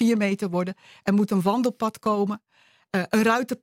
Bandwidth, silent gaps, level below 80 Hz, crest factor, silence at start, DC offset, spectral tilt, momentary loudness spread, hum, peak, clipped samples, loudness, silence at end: 16.5 kHz; none; -66 dBFS; 18 dB; 0 s; under 0.1%; -6 dB/octave; 8 LU; none; -6 dBFS; under 0.1%; -24 LUFS; 0.1 s